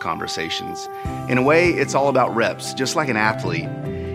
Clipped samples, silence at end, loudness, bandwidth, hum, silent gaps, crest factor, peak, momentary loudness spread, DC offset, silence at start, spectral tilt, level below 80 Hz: under 0.1%; 0 s; -20 LUFS; 16 kHz; none; none; 18 dB; -2 dBFS; 12 LU; under 0.1%; 0 s; -4.5 dB/octave; -46 dBFS